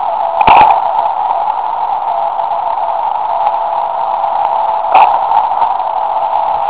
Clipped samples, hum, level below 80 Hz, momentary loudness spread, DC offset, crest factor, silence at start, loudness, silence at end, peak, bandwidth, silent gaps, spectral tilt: 0.8%; none; -44 dBFS; 8 LU; 1%; 12 dB; 0 s; -12 LUFS; 0 s; 0 dBFS; 4 kHz; none; -7 dB/octave